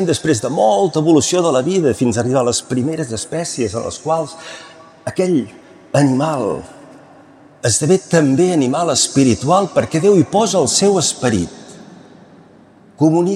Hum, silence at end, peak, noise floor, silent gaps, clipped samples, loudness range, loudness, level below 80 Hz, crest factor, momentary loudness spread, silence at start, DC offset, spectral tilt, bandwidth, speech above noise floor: none; 0 s; -2 dBFS; -45 dBFS; none; under 0.1%; 6 LU; -15 LUFS; -54 dBFS; 14 dB; 10 LU; 0 s; under 0.1%; -5 dB/octave; 14.5 kHz; 30 dB